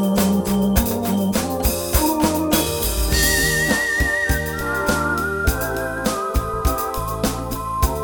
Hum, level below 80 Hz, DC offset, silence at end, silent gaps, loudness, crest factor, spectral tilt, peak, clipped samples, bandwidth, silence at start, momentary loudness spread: none; -28 dBFS; under 0.1%; 0 s; none; -20 LUFS; 18 dB; -4 dB/octave; -2 dBFS; under 0.1%; 19.5 kHz; 0 s; 6 LU